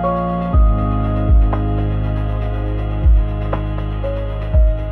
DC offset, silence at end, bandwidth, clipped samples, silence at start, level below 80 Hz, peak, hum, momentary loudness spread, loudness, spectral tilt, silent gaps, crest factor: under 0.1%; 0 s; 3.7 kHz; under 0.1%; 0 s; -16 dBFS; -4 dBFS; none; 7 LU; -18 LUFS; -10.5 dB/octave; none; 12 dB